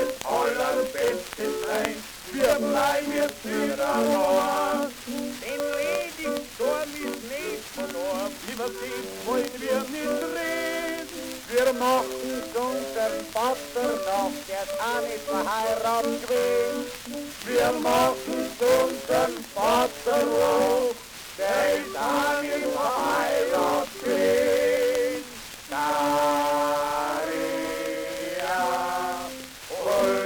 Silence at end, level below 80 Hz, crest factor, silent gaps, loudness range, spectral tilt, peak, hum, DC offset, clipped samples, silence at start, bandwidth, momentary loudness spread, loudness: 0 s; -56 dBFS; 20 dB; none; 5 LU; -3 dB/octave; -6 dBFS; none; under 0.1%; under 0.1%; 0 s; over 20 kHz; 10 LU; -26 LUFS